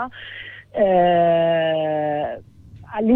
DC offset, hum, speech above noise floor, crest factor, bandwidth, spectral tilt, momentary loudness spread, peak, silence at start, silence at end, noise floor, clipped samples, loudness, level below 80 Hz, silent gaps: under 0.1%; none; 19 dB; 14 dB; 4 kHz; -9 dB/octave; 18 LU; -6 dBFS; 0 s; 0 s; -38 dBFS; under 0.1%; -19 LUFS; -54 dBFS; none